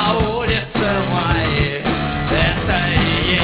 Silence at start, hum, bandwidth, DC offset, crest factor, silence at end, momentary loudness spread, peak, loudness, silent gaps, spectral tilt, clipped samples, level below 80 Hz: 0 s; none; 4 kHz; under 0.1%; 16 dB; 0 s; 3 LU; -2 dBFS; -17 LUFS; none; -9.5 dB/octave; under 0.1%; -28 dBFS